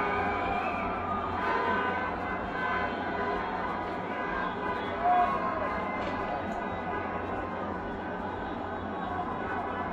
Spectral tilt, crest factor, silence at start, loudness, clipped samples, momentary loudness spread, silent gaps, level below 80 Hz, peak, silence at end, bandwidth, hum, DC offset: -7 dB/octave; 18 dB; 0 s; -31 LUFS; under 0.1%; 7 LU; none; -50 dBFS; -14 dBFS; 0 s; 8.8 kHz; none; under 0.1%